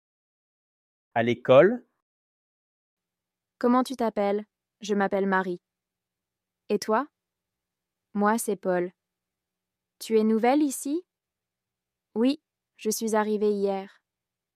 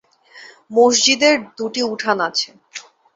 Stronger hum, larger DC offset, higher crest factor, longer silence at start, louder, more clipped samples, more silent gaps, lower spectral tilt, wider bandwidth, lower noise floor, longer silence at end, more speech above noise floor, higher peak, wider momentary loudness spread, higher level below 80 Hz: neither; neither; about the same, 22 dB vs 18 dB; first, 1.15 s vs 0.35 s; second, -26 LUFS vs -16 LUFS; neither; first, 2.02-2.97 s vs none; first, -5 dB/octave vs -1 dB/octave; first, 15.5 kHz vs 8 kHz; first, -88 dBFS vs -44 dBFS; first, 0.7 s vs 0.35 s; first, 64 dB vs 27 dB; second, -6 dBFS vs -2 dBFS; second, 14 LU vs 20 LU; second, -78 dBFS vs -66 dBFS